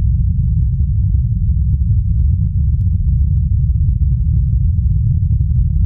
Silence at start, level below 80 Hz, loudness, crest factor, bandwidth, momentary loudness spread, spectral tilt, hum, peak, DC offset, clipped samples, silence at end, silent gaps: 0 s; -16 dBFS; -16 LUFS; 8 dB; 0.5 kHz; 1 LU; -14.5 dB/octave; none; -4 dBFS; under 0.1%; under 0.1%; 0 s; none